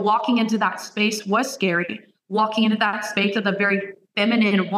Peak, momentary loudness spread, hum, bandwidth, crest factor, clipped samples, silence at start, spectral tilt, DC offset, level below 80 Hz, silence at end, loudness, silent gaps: -6 dBFS; 6 LU; none; 14.5 kHz; 16 dB; under 0.1%; 0 s; -4.5 dB/octave; under 0.1%; -76 dBFS; 0 s; -21 LUFS; none